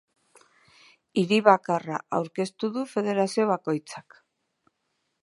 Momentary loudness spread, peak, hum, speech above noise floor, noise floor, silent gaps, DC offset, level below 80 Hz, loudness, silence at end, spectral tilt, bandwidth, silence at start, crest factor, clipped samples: 11 LU; -2 dBFS; none; 52 dB; -77 dBFS; none; under 0.1%; -78 dBFS; -25 LUFS; 1.2 s; -5.5 dB/octave; 11.5 kHz; 1.15 s; 26 dB; under 0.1%